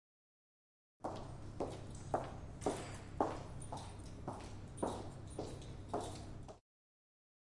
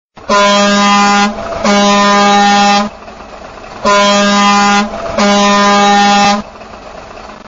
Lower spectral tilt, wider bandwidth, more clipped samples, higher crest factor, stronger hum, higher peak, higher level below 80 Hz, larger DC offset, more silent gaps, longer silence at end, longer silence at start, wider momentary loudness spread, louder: first, -6 dB/octave vs -2.5 dB/octave; first, 11.5 kHz vs 7.8 kHz; neither; first, 28 dB vs 10 dB; neither; second, -18 dBFS vs 0 dBFS; second, -58 dBFS vs -40 dBFS; neither; neither; first, 1 s vs 0 s; first, 1 s vs 0.2 s; second, 10 LU vs 22 LU; second, -46 LUFS vs -8 LUFS